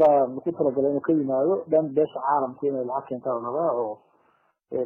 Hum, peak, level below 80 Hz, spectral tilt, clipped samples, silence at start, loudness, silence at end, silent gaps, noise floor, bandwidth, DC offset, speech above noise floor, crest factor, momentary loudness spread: none; -8 dBFS; -70 dBFS; -10.5 dB/octave; under 0.1%; 0 s; -25 LUFS; 0 s; none; -66 dBFS; 3.7 kHz; under 0.1%; 41 dB; 16 dB; 8 LU